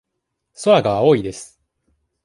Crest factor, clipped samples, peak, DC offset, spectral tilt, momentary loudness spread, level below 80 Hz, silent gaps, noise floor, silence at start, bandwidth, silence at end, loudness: 18 dB; under 0.1%; -2 dBFS; under 0.1%; -5.5 dB/octave; 15 LU; -54 dBFS; none; -77 dBFS; 0.6 s; 11.5 kHz; 0.8 s; -16 LUFS